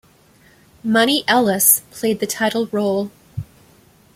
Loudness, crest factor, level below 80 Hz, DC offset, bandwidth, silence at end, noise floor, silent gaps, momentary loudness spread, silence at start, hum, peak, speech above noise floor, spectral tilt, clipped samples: -17 LUFS; 20 dB; -56 dBFS; under 0.1%; 16.5 kHz; 0.7 s; -52 dBFS; none; 17 LU; 0.85 s; none; 0 dBFS; 34 dB; -2.5 dB/octave; under 0.1%